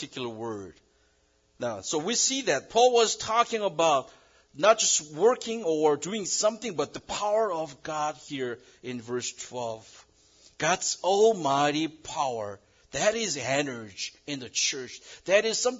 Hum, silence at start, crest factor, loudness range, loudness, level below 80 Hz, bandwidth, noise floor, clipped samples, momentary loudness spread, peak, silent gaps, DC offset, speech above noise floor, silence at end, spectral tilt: none; 0 s; 22 dB; 8 LU; -27 LUFS; -66 dBFS; 7.8 kHz; -67 dBFS; under 0.1%; 14 LU; -6 dBFS; none; under 0.1%; 40 dB; 0 s; -2 dB/octave